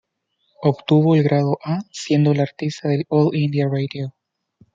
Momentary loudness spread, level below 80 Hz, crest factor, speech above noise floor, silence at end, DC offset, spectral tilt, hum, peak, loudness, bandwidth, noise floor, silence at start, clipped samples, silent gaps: 10 LU; -64 dBFS; 18 dB; 51 dB; 0.65 s; under 0.1%; -7.5 dB/octave; none; -2 dBFS; -19 LUFS; 7.6 kHz; -70 dBFS; 0.6 s; under 0.1%; none